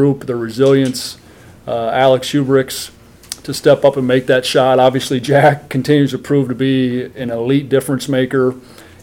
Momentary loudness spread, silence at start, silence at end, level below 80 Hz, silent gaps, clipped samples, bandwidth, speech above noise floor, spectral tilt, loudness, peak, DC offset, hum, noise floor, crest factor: 12 LU; 0 s; 0.2 s; -52 dBFS; none; under 0.1%; 17 kHz; 20 dB; -5.5 dB/octave; -14 LUFS; 0 dBFS; under 0.1%; none; -33 dBFS; 14 dB